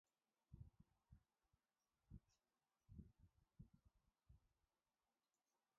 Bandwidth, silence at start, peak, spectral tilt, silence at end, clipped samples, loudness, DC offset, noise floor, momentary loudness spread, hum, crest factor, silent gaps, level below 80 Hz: 1.7 kHz; 0.5 s; -46 dBFS; -12 dB/octave; 1.3 s; under 0.1%; -68 LUFS; under 0.1%; under -90 dBFS; 2 LU; none; 26 dB; none; -76 dBFS